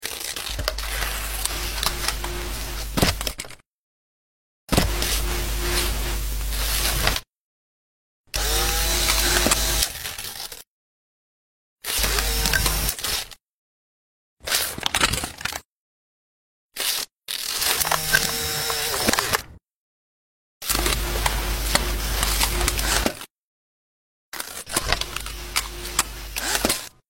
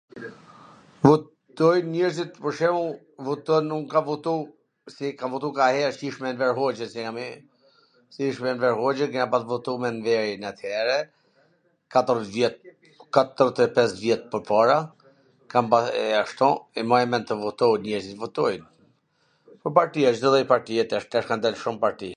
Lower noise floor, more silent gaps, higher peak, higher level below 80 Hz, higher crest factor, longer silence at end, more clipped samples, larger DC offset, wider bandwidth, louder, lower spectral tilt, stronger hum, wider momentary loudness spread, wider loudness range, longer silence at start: first, under -90 dBFS vs -67 dBFS; first, 3.66-4.67 s, 7.36-8.24 s, 10.67-11.76 s, 13.42-14.37 s, 15.65-16.70 s, 19.71-20.61 s, 23.30-24.32 s vs none; about the same, 0 dBFS vs 0 dBFS; first, -32 dBFS vs -68 dBFS; about the same, 26 dB vs 24 dB; first, 0.2 s vs 0 s; neither; neither; first, 16.5 kHz vs 10 kHz; about the same, -23 LUFS vs -24 LUFS; second, -2 dB/octave vs -5.5 dB/octave; neither; about the same, 11 LU vs 11 LU; about the same, 4 LU vs 4 LU; second, 0 s vs 0.15 s